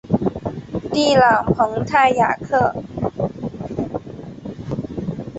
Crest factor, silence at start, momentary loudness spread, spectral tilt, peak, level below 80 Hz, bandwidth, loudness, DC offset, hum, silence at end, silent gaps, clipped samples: 16 dB; 0.05 s; 15 LU; -6 dB/octave; -2 dBFS; -44 dBFS; 8.2 kHz; -19 LUFS; under 0.1%; none; 0 s; none; under 0.1%